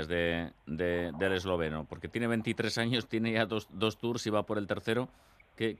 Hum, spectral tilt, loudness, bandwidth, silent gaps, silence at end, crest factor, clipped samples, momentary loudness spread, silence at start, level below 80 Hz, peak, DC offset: none; -5.5 dB/octave; -33 LUFS; 14 kHz; none; 0.05 s; 22 dB; under 0.1%; 6 LU; 0 s; -60 dBFS; -12 dBFS; under 0.1%